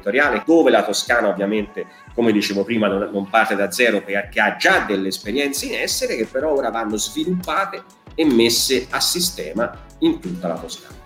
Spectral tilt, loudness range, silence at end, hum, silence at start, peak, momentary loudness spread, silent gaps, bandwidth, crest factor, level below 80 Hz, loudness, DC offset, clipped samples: -3 dB/octave; 2 LU; 0.05 s; none; 0.05 s; -2 dBFS; 11 LU; none; 16.5 kHz; 18 dB; -48 dBFS; -19 LUFS; under 0.1%; under 0.1%